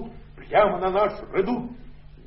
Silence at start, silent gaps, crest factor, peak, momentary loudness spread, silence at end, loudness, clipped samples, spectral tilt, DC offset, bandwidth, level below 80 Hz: 0 s; none; 18 dB; -8 dBFS; 14 LU; 0.05 s; -23 LUFS; under 0.1%; -10 dB/octave; under 0.1%; 5.8 kHz; -46 dBFS